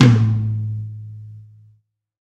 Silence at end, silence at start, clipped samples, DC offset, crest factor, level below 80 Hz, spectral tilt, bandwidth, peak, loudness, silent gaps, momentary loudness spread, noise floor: 0.85 s; 0 s; under 0.1%; under 0.1%; 18 dB; -48 dBFS; -7.5 dB/octave; 7.8 kHz; 0 dBFS; -19 LUFS; none; 23 LU; -59 dBFS